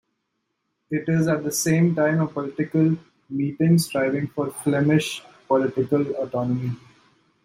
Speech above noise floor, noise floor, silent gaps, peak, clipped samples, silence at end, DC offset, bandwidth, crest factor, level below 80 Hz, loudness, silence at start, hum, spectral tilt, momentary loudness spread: 55 dB; -76 dBFS; none; -8 dBFS; under 0.1%; 0.7 s; under 0.1%; 15.5 kHz; 16 dB; -62 dBFS; -23 LUFS; 0.9 s; none; -6 dB/octave; 10 LU